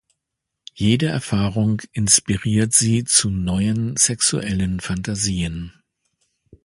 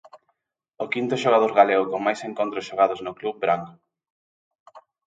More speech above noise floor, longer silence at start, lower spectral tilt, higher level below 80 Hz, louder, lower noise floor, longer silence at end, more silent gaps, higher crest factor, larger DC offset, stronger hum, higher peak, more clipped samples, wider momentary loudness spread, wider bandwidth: first, 61 dB vs 52 dB; first, 0.75 s vs 0.15 s; second, -3.5 dB/octave vs -5 dB/octave; first, -40 dBFS vs -72 dBFS; first, -19 LUFS vs -22 LUFS; first, -81 dBFS vs -74 dBFS; first, 0.95 s vs 0.4 s; second, none vs 4.10-4.51 s, 4.60-4.66 s; about the same, 20 dB vs 22 dB; neither; neither; about the same, 0 dBFS vs -2 dBFS; neither; second, 9 LU vs 12 LU; first, 11.5 kHz vs 9 kHz